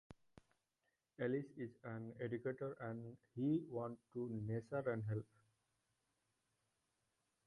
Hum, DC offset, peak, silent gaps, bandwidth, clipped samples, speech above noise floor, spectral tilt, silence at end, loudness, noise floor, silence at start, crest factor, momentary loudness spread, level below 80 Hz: none; under 0.1%; -28 dBFS; none; 11 kHz; under 0.1%; 44 dB; -9.5 dB/octave; 2.25 s; -45 LUFS; -88 dBFS; 0.1 s; 18 dB; 10 LU; -78 dBFS